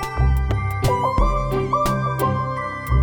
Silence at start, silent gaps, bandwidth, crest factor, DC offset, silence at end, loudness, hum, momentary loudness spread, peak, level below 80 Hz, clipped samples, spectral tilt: 0 s; none; over 20 kHz; 14 dB; under 0.1%; 0 s; -21 LUFS; none; 4 LU; -6 dBFS; -24 dBFS; under 0.1%; -6.5 dB/octave